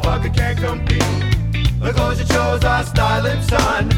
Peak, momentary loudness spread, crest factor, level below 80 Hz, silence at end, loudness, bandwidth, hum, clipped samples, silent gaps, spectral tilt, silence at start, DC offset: 0 dBFS; 3 LU; 16 dB; -22 dBFS; 0 s; -17 LUFS; 17 kHz; none; under 0.1%; none; -5.5 dB/octave; 0 s; under 0.1%